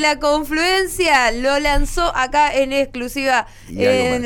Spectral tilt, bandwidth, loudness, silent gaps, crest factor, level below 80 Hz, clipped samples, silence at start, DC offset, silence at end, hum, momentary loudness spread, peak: -3 dB/octave; 19 kHz; -17 LUFS; none; 12 dB; -28 dBFS; under 0.1%; 0 s; under 0.1%; 0 s; none; 5 LU; -4 dBFS